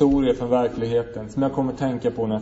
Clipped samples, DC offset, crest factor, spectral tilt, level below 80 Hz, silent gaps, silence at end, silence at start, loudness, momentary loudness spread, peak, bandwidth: under 0.1%; under 0.1%; 16 dB; -8 dB/octave; -42 dBFS; none; 0 s; 0 s; -23 LUFS; 5 LU; -6 dBFS; 8 kHz